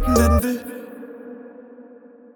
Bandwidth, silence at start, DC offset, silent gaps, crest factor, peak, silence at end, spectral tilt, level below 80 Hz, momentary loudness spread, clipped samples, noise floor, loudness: 19.5 kHz; 0 s; under 0.1%; none; 18 dB; -4 dBFS; 0.55 s; -6 dB/octave; -30 dBFS; 26 LU; under 0.1%; -45 dBFS; -19 LUFS